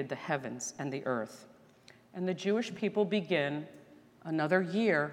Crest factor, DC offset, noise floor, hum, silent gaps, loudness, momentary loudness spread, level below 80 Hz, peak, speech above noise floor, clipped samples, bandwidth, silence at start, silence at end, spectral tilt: 20 dB; under 0.1%; -60 dBFS; none; none; -33 LUFS; 15 LU; -82 dBFS; -14 dBFS; 27 dB; under 0.1%; 13.5 kHz; 0 s; 0 s; -5 dB/octave